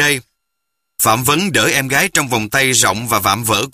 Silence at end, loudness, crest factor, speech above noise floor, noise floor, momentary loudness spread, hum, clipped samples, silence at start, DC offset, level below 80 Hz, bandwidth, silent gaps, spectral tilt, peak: 0.05 s; -14 LUFS; 16 dB; 61 dB; -76 dBFS; 4 LU; none; under 0.1%; 0 s; under 0.1%; -48 dBFS; 15.5 kHz; none; -2.5 dB/octave; 0 dBFS